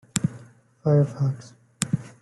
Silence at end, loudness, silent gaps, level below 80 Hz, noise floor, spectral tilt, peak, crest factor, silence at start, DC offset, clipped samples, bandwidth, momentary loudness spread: 0.15 s; -25 LUFS; none; -60 dBFS; -48 dBFS; -6 dB/octave; -2 dBFS; 24 dB; 0.15 s; under 0.1%; under 0.1%; 12 kHz; 10 LU